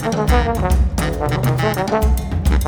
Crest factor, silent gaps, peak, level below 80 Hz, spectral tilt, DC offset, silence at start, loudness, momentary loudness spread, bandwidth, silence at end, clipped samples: 14 dB; none; -4 dBFS; -20 dBFS; -6 dB/octave; under 0.1%; 0 s; -18 LUFS; 3 LU; 18.5 kHz; 0 s; under 0.1%